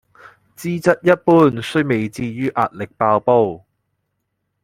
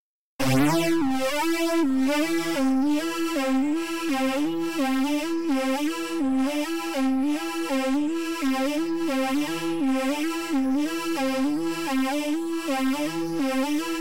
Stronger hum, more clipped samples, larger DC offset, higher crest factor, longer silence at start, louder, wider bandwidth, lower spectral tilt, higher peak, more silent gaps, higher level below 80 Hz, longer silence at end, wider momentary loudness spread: neither; neither; second, under 0.1% vs 1%; first, 18 dB vs 10 dB; first, 0.6 s vs 0 s; first, -17 LUFS vs -25 LUFS; about the same, 15.5 kHz vs 16 kHz; first, -7 dB/octave vs -4.5 dB/octave; first, 0 dBFS vs -14 dBFS; second, none vs 0.00-0.39 s; about the same, -56 dBFS vs -56 dBFS; first, 1.05 s vs 0 s; first, 11 LU vs 4 LU